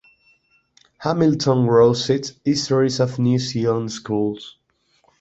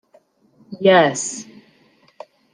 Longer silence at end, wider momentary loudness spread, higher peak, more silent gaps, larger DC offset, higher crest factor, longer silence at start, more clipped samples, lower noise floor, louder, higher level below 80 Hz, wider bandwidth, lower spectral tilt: second, 0.7 s vs 1.1 s; second, 10 LU vs 21 LU; about the same, -2 dBFS vs -2 dBFS; neither; neither; about the same, 18 dB vs 20 dB; first, 1 s vs 0.7 s; neither; first, -64 dBFS vs -56 dBFS; second, -19 LUFS vs -16 LUFS; first, -56 dBFS vs -70 dBFS; second, 8.2 kHz vs 10 kHz; first, -6 dB/octave vs -3.5 dB/octave